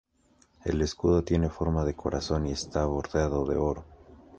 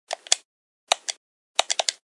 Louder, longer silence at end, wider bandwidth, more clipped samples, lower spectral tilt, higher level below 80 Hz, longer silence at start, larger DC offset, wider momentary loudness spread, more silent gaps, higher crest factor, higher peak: second, -29 LUFS vs -25 LUFS; second, 0 s vs 0.2 s; second, 9.2 kHz vs 11.5 kHz; neither; first, -6.5 dB/octave vs 3 dB/octave; first, -38 dBFS vs -72 dBFS; first, 0.65 s vs 0.1 s; neither; about the same, 7 LU vs 6 LU; second, none vs 0.45-0.87 s, 1.17-1.55 s; second, 18 dB vs 28 dB; second, -12 dBFS vs 0 dBFS